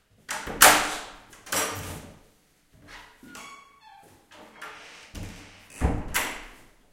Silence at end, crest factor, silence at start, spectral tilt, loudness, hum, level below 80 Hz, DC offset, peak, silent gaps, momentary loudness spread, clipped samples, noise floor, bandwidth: 0.4 s; 30 dB; 0.3 s; -1.5 dB/octave; -23 LUFS; none; -42 dBFS; under 0.1%; 0 dBFS; none; 30 LU; under 0.1%; -62 dBFS; 16.5 kHz